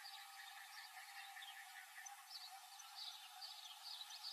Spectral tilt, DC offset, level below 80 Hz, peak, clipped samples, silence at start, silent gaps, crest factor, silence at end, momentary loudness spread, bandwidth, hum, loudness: 7 dB/octave; under 0.1%; under -90 dBFS; -40 dBFS; under 0.1%; 0 s; none; 16 dB; 0 s; 4 LU; 15.5 kHz; none; -54 LUFS